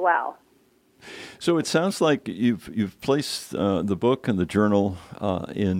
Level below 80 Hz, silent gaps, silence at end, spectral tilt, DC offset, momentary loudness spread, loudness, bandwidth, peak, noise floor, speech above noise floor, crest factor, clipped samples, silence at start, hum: -56 dBFS; none; 0 s; -5.5 dB/octave; under 0.1%; 8 LU; -24 LUFS; 16 kHz; -6 dBFS; -61 dBFS; 37 dB; 18 dB; under 0.1%; 0 s; none